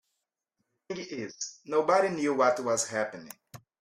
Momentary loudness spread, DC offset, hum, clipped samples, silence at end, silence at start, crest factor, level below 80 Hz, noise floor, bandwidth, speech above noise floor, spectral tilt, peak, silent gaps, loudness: 17 LU; under 0.1%; none; under 0.1%; 0.25 s; 0.9 s; 20 dB; -76 dBFS; -84 dBFS; 15.5 kHz; 55 dB; -3.5 dB/octave; -10 dBFS; none; -29 LUFS